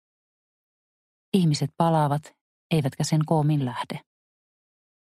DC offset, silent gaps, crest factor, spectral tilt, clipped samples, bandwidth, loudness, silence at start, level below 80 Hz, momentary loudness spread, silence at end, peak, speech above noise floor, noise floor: under 0.1%; 2.41-2.70 s; 18 dB; -6.5 dB/octave; under 0.1%; 13.5 kHz; -24 LUFS; 1.35 s; -64 dBFS; 9 LU; 1.1 s; -8 dBFS; over 67 dB; under -90 dBFS